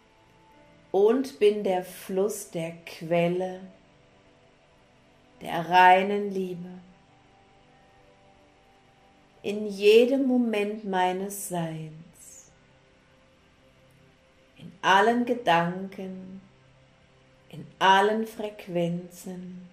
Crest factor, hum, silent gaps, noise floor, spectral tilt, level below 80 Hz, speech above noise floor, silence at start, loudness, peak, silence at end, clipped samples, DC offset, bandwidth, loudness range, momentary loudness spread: 22 dB; none; none; -59 dBFS; -5 dB/octave; -68 dBFS; 34 dB; 0.95 s; -25 LUFS; -6 dBFS; 0.05 s; under 0.1%; under 0.1%; 15.5 kHz; 10 LU; 23 LU